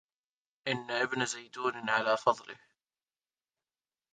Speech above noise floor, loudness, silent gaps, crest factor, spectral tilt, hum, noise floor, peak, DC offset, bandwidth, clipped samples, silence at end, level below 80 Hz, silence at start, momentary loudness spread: over 58 dB; -32 LUFS; none; 24 dB; -3 dB/octave; none; under -90 dBFS; -12 dBFS; under 0.1%; 9.6 kHz; under 0.1%; 1.6 s; -80 dBFS; 0.65 s; 11 LU